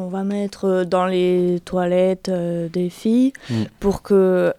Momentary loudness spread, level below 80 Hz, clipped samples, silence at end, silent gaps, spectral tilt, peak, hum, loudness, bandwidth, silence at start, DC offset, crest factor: 7 LU; -46 dBFS; under 0.1%; 0.05 s; none; -7.5 dB/octave; -6 dBFS; none; -20 LUFS; 14 kHz; 0 s; under 0.1%; 14 dB